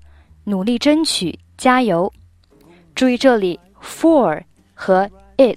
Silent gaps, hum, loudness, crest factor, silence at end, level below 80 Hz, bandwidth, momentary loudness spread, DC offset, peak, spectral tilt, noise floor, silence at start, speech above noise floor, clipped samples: none; none; -17 LUFS; 16 dB; 0 s; -52 dBFS; 15.5 kHz; 14 LU; under 0.1%; 0 dBFS; -4.5 dB/octave; -49 dBFS; 0.45 s; 33 dB; under 0.1%